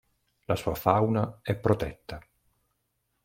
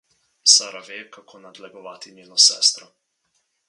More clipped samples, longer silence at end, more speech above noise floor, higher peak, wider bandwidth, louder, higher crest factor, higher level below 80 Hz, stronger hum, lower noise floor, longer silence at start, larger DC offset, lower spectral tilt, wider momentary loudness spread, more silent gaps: neither; first, 1.05 s vs 0.9 s; about the same, 50 dB vs 50 dB; second, -6 dBFS vs 0 dBFS; first, 16.5 kHz vs 11.5 kHz; second, -28 LUFS vs -15 LUFS; about the same, 24 dB vs 22 dB; first, -52 dBFS vs -88 dBFS; neither; first, -77 dBFS vs -71 dBFS; about the same, 0.5 s vs 0.45 s; neither; first, -7.5 dB/octave vs 3 dB/octave; second, 18 LU vs 25 LU; neither